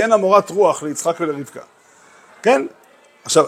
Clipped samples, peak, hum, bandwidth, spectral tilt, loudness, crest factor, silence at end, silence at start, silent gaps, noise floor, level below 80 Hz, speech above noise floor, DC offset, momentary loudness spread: under 0.1%; 0 dBFS; none; 16 kHz; -3.5 dB/octave; -17 LUFS; 18 dB; 0 s; 0 s; none; -49 dBFS; -70 dBFS; 32 dB; under 0.1%; 20 LU